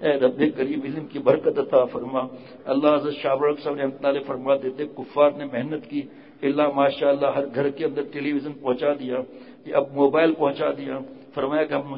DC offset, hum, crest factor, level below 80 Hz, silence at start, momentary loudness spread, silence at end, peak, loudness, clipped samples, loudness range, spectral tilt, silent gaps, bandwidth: under 0.1%; none; 18 dB; -66 dBFS; 0 s; 11 LU; 0 s; -6 dBFS; -23 LUFS; under 0.1%; 2 LU; -10.5 dB/octave; none; 5.4 kHz